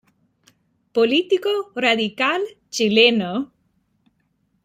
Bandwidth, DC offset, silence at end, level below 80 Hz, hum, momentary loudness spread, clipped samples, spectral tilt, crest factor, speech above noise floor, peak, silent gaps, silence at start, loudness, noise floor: 15 kHz; under 0.1%; 1.2 s; -68 dBFS; none; 12 LU; under 0.1%; -3.5 dB/octave; 20 dB; 48 dB; -2 dBFS; none; 0.95 s; -19 LUFS; -67 dBFS